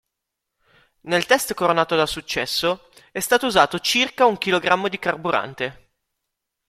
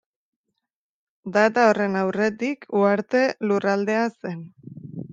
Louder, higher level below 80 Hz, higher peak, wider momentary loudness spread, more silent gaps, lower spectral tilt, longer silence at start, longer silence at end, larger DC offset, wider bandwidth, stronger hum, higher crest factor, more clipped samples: about the same, -20 LUFS vs -22 LUFS; first, -54 dBFS vs -70 dBFS; first, 0 dBFS vs -4 dBFS; second, 10 LU vs 19 LU; neither; second, -3 dB/octave vs -6 dB/octave; second, 1.05 s vs 1.25 s; first, 0.95 s vs 0 s; neither; first, 15.5 kHz vs 7.8 kHz; neither; about the same, 22 dB vs 20 dB; neither